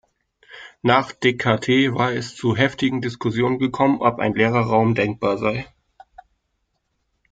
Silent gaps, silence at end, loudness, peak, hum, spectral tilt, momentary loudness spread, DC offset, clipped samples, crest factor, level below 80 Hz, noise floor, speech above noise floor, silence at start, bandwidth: none; 1.65 s; -20 LUFS; -2 dBFS; none; -6.5 dB/octave; 7 LU; under 0.1%; under 0.1%; 20 dB; -54 dBFS; -72 dBFS; 53 dB; 0.5 s; 9 kHz